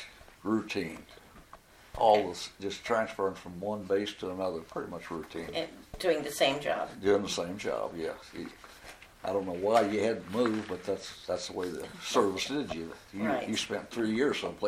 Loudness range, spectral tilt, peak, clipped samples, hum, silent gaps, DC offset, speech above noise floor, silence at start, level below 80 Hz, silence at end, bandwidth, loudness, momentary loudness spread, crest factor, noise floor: 3 LU; -4 dB/octave; -10 dBFS; under 0.1%; none; none; under 0.1%; 23 dB; 0 s; -60 dBFS; 0 s; 16 kHz; -32 LUFS; 13 LU; 22 dB; -55 dBFS